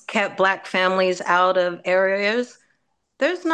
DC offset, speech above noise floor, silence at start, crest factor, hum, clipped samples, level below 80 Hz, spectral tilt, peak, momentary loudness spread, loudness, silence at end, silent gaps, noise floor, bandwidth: under 0.1%; 50 dB; 0.1 s; 16 dB; none; under 0.1%; -74 dBFS; -4.5 dB/octave; -4 dBFS; 6 LU; -20 LUFS; 0 s; none; -70 dBFS; 9.4 kHz